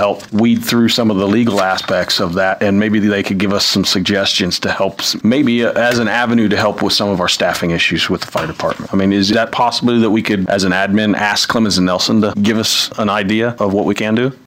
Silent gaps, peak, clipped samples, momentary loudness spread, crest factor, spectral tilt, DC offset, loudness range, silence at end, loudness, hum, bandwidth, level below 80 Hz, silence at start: none; -4 dBFS; under 0.1%; 3 LU; 10 dB; -4.5 dB/octave; under 0.1%; 1 LU; 0.1 s; -14 LUFS; none; 16.5 kHz; -48 dBFS; 0 s